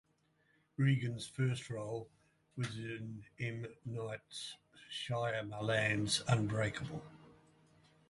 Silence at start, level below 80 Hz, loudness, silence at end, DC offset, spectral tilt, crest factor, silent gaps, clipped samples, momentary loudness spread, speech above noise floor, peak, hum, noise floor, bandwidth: 0.8 s; -66 dBFS; -38 LUFS; 0.75 s; under 0.1%; -5 dB/octave; 24 dB; none; under 0.1%; 15 LU; 37 dB; -16 dBFS; none; -75 dBFS; 11.5 kHz